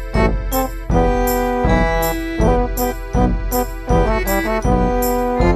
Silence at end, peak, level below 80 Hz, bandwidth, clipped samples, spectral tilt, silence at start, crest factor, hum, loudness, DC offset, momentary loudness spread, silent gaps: 0 s; -2 dBFS; -22 dBFS; 15.5 kHz; under 0.1%; -6 dB/octave; 0 s; 14 dB; none; -18 LUFS; under 0.1%; 4 LU; none